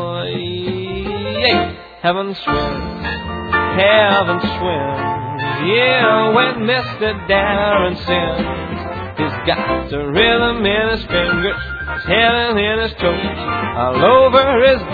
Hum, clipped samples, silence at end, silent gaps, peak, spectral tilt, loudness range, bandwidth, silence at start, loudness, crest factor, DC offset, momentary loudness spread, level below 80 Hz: none; under 0.1%; 0 s; none; 0 dBFS; -7.5 dB/octave; 3 LU; 4.9 kHz; 0 s; -16 LUFS; 16 dB; under 0.1%; 11 LU; -34 dBFS